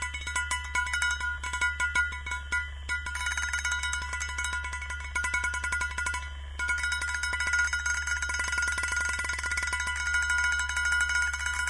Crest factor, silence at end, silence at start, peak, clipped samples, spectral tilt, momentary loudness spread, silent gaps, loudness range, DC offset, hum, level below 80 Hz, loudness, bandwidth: 16 dB; 0 s; 0 s; -14 dBFS; under 0.1%; -0.5 dB/octave; 6 LU; none; 3 LU; 0.2%; none; -40 dBFS; -29 LUFS; 11 kHz